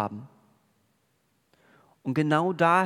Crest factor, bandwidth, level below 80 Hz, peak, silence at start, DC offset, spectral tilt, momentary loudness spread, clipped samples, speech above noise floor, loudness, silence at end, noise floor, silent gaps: 20 dB; 13 kHz; -76 dBFS; -8 dBFS; 0 s; under 0.1%; -7 dB/octave; 16 LU; under 0.1%; 46 dB; -26 LUFS; 0 s; -71 dBFS; none